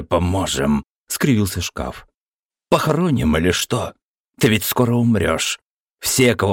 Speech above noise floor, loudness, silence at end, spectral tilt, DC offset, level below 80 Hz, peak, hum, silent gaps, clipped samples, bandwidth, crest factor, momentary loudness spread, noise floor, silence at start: over 72 dB; -19 LUFS; 0 s; -4.5 dB/octave; under 0.1%; -38 dBFS; -4 dBFS; none; 0.90-1.04 s, 2.17-2.26 s, 2.45-2.49 s, 4.05-4.14 s, 4.20-4.25 s, 5.66-5.86 s, 5.94-5.98 s; under 0.1%; 17 kHz; 16 dB; 9 LU; under -90 dBFS; 0 s